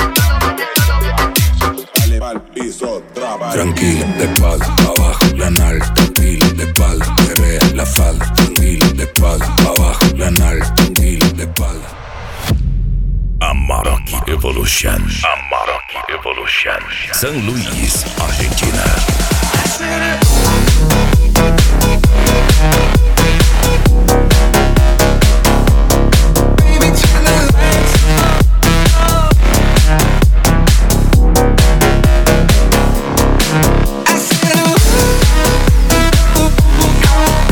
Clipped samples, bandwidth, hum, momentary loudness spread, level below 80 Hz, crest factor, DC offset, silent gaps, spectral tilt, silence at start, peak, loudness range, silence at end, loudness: under 0.1%; 19.5 kHz; none; 7 LU; -12 dBFS; 10 dB; under 0.1%; none; -4.5 dB/octave; 0 s; 0 dBFS; 5 LU; 0 s; -12 LUFS